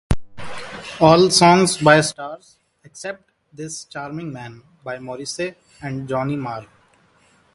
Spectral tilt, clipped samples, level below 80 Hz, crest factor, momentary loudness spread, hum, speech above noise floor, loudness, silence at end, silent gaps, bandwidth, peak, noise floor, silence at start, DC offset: -4.5 dB/octave; under 0.1%; -42 dBFS; 20 dB; 23 LU; none; 38 dB; -17 LUFS; 0.9 s; none; 11.5 kHz; 0 dBFS; -57 dBFS; 0.1 s; under 0.1%